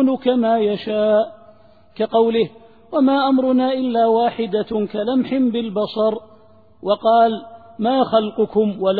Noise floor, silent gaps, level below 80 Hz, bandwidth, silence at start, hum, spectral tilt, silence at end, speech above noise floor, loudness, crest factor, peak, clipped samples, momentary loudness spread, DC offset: -50 dBFS; none; -60 dBFS; 4.9 kHz; 0 s; none; -9.5 dB/octave; 0 s; 33 dB; -18 LUFS; 16 dB; -2 dBFS; under 0.1%; 7 LU; 0.2%